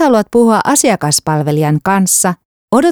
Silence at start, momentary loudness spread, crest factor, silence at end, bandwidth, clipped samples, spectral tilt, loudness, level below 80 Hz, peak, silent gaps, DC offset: 0 s; 5 LU; 12 dB; 0 s; over 20 kHz; under 0.1%; -4.5 dB/octave; -11 LUFS; -50 dBFS; 0 dBFS; 2.45-2.68 s; under 0.1%